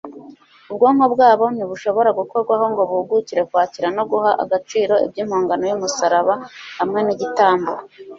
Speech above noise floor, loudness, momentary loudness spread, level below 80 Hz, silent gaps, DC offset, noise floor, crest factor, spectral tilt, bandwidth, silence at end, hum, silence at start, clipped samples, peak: 26 dB; -18 LUFS; 9 LU; -64 dBFS; none; under 0.1%; -43 dBFS; 16 dB; -4.5 dB/octave; 7.6 kHz; 0 s; none; 0.05 s; under 0.1%; -2 dBFS